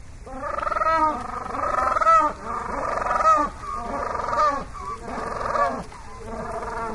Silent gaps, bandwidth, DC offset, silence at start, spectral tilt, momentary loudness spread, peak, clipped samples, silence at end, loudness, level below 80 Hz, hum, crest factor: none; 11.5 kHz; under 0.1%; 0 s; -5 dB/octave; 15 LU; -6 dBFS; under 0.1%; 0 s; -23 LUFS; -42 dBFS; none; 18 dB